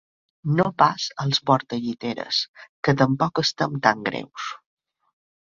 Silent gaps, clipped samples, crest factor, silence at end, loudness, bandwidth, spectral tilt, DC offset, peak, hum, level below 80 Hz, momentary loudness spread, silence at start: 2.48-2.54 s, 2.69-2.83 s; under 0.1%; 22 dB; 1.05 s; -23 LUFS; 7.4 kHz; -5 dB/octave; under 0.1%; -2 dBFS; none; -60 dBFS; 13 LU; 0.45 s